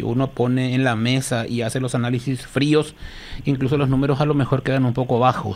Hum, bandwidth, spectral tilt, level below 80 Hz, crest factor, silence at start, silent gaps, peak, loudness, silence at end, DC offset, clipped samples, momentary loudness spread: none; 14 kHz; -6.5 dB/octave; -42 dBFS; 16 dB; 0 s; none; -4 dBFS; -20 LUFS; 0 s; under 0.1%; under 0.1%; 6 LU